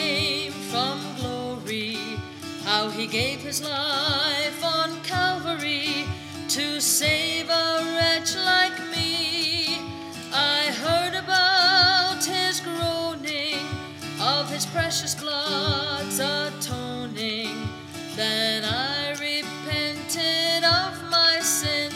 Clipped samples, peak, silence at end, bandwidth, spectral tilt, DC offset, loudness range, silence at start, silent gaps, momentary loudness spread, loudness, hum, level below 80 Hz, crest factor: under 0.1%; -8 dBFS; 0 s; 16.5 kHz; -2 dB/octave; under 0.1%; 6 LU; 0 s; none; 11 LU; -23 LUFS; none; -62 dBFS; 18 dB